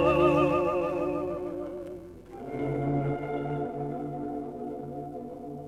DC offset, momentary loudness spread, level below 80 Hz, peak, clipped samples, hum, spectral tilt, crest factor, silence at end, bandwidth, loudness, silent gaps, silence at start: under 0.1%; 16 LU; -52 dBFS; -10 dBFS; under 0.1%; none; -8.5 dB/octave; 18 dB; 0 s; 12.5 kHz; -30 LUFS; none; 0 s